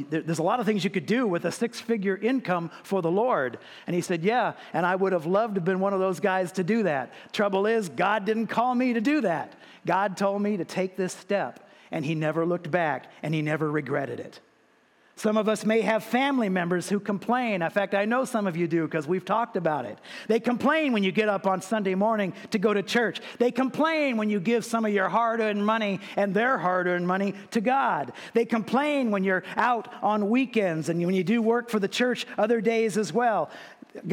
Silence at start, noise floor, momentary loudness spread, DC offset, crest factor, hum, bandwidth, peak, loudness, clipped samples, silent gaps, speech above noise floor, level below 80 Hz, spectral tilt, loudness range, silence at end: 0 s; -62 dBFS; 6 LU; under 0.1%; 16 dB; none; 16.5 kHz; -8 dBFS; -26 LUFS; under 0.1%; none; 37 dB; -80 dBFS; -6 dB/octave; 3 LU; 0 s